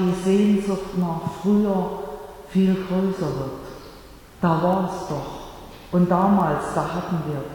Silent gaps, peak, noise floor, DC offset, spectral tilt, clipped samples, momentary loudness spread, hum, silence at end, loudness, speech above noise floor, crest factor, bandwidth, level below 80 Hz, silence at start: none; -8 dBFS; -44 dBFS; under 0.1%; -7.5 dB/octave; under 0.1%; 18 LU; none; 0 s; -22 LUFS; 23 dB; 16 dB; 18 kHz; -48 dBFS; 0 s